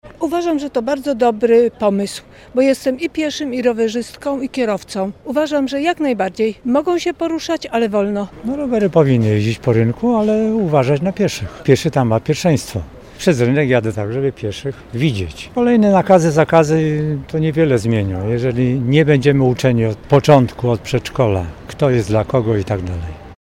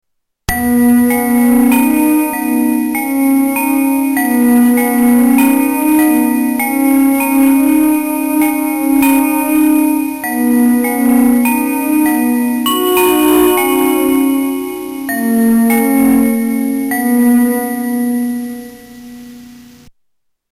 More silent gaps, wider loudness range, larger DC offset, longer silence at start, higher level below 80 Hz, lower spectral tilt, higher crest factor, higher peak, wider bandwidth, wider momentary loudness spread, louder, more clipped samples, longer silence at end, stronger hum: neither; about the same, 4 LU vs 2 LU; neither; second, 0.05 s vs 0.5 s; about the same, -42 dBFS vs -42 dBFS; first, -7 dB/octave vs -4 dB/octave; first, 16 dB vs 8 dB; first, 0 dBFS vs -4 dBFS; about the same, 16 kHz vs 17 kHz; first, 10 LU vs 7 LU; second, -16 LUFS vs -12 LUFS; neither; second, 0.1 s vs 0.95 s; neither